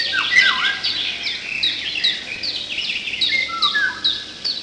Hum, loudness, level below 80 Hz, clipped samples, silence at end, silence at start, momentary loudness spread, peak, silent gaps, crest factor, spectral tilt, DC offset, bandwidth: none; -18 LUFS; -56 dBFS; under 0.1%; 0 s; 0 s; 10 LU; -2 dBFS; none; 20 dB; 0 dB/octave; under 0.1%; 10.5 kHz